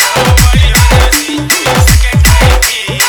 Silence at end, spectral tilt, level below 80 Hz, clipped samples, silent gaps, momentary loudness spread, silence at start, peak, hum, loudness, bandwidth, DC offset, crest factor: 0 s; -3.5 dB/octave; -10 dBFS; 2%; none; 4 LU; 0 s; 0 dBFS; none; -7 LUFS; over 20 kHz; under 0.1%; 6 dB